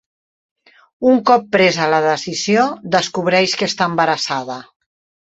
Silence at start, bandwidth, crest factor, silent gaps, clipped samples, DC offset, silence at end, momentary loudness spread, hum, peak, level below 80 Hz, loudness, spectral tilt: 1 s; 8.2 kHz; 16 dB; none; under 0.1%; under 0.1%; 0.7 s; 7 LU; none; -2 dBFS; -60 dBFS; -16 LUFS; -4 dB/octave